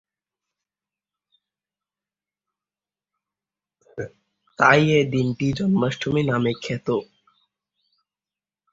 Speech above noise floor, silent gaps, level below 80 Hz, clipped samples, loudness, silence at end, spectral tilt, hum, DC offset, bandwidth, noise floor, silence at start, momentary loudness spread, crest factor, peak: over 70 dB; none; -58 dBFS; under 0.1%; -21 LUFS; 1.7 s; -6.5 dB/octave; none; under 0.1%; 7.8 kHz; under -90 dBFS; 3.95 s; 19 LU; 24 dB; -2 dBFS